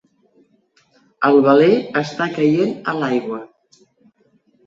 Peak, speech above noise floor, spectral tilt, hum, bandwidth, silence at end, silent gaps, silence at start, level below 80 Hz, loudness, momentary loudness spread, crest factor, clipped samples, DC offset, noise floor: -2 dBFS; 44 dB; -7 dB/octave; none; 7.6 kHz; 1.2 s; none; 1.2 s; -64 dBFS; -16 LUFS; 10 LU; 18 dB; under 0.1%; under 0.1%; -59 dBFS